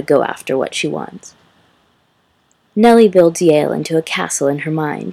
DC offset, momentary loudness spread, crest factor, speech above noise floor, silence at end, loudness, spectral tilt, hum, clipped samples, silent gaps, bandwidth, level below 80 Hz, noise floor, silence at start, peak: under 0.1%; 12 LU; 16 dB; 45 dB; 0 s; -14 LUFS; -5 dB/octave; none; under 0.1%; none; 14.5 kHz; -58 dBFS; -59 dBFS; 0 s; 0 dBFS